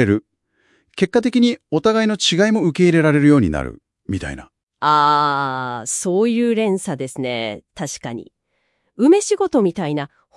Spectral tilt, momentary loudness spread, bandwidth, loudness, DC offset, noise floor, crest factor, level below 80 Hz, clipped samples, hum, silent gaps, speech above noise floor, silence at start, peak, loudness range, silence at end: -5 dB/octave; 15 LU; 12 kHz; -17 LUFS; under 0.1%; -68 dBFS; 18 dB; -46 dBFS; under 0.1%; none; 4.63-4.67 s; 51 dB; 0 s; 0 dBFS; 5 LU; 0.3 s